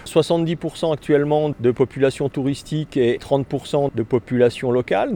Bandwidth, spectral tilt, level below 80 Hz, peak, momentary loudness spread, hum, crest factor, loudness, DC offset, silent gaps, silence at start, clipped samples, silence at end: 17.5 kHz; -7 dB/octave; -50 dBFS; -4 dBFS; 6 LU; none; 16 dB; -20 LUFS; under 0.1%; none; 0 s; under 0.1%; 0 s